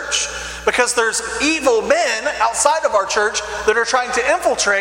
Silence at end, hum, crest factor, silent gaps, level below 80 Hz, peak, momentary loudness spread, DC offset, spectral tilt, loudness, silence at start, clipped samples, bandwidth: 0 s; 60 Hz at -50 dBFS; 18 dB; none; -44 dBFS; 0 dBFS; 4 LU; under 0.1%; -1 dB/octave; -17 LUFS; 0 s; under 0.1%; 16.5 kHz